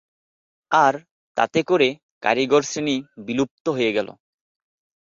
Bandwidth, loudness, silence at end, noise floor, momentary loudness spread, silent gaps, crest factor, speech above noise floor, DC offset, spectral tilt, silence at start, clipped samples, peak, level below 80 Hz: 7.8 kHz; -21 LUFS; 1 s; under -90 dBFS; 9 LU; 1.11-1.35 s, 2.03-2.21 s, 3.51-3.65 s; 20 dB; over 70 dB; under 0.1%; -4 dB/octave; 0.7 s; under 0.1%; -2 dBFS; -64 dBFS